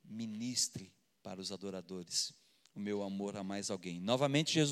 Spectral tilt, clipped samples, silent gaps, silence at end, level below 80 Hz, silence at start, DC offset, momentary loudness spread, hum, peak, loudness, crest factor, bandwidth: -3.5 dB/octave; under 0.1%; none; 0 s; -84 dBFS; 0.05 s; under 0.1%; 14 LU; none; -16 dBFS; -37 LUFS; 22 dB; 15.5 kHz